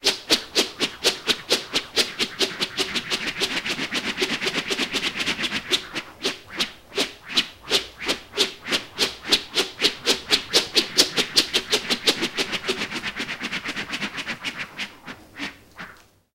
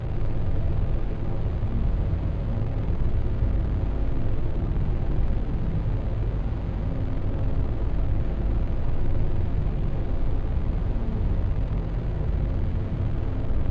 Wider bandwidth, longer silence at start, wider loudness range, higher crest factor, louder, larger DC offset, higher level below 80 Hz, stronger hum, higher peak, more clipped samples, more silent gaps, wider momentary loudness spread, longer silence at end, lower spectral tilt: first, 16 kHz vs 4.3 kHz; about the same, 0 s vs 0 s; first, 6 LU vs 1 LU; first, 24 dB vs 12 dB; first, -23 LUFS vs -28 LUFS; neither; second, -54 dBFS vs -26 dBFS; neither; first, 0 dBFS vs -12 dBFS; neither; neither; first, 11 LU vs 2 LU; first, 0.4 s vs 0 s; second, -1 dB/octave vs -10 dB/octave